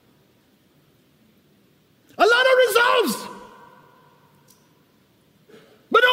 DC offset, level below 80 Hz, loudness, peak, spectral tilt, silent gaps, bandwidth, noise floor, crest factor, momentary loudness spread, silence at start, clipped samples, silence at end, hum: under 0.1%; -70 dBFS; -18 LUFS; -4 dBFS; -2 dB/octave; none; 16 kHz; -59 dBFS; 18 dB; 18 LU; 2.2 s; under 0.1%; 0 s; none